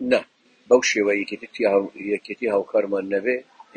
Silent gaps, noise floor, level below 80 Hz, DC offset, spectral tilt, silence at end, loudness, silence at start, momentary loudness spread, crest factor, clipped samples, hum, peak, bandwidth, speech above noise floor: none; -48 dBFS; -66 dBFS; under 0.1%; -3.5 dB/octave; 0.35 s; -22 LUFS; 0 s; 9 LU; 20 dB; under 0.1%; none; -4 dBFS; 9 kHz; 26 dB